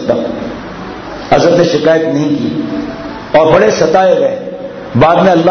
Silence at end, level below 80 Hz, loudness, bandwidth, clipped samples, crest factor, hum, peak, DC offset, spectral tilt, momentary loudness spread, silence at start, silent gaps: 0 s; -40 dBFS; -10 LUFS; 6.6 kHz; 0.2%; 10 dB; none; 0 dBFS; under 0.1%; -6 dB/octave; 16 LU; 0 s; none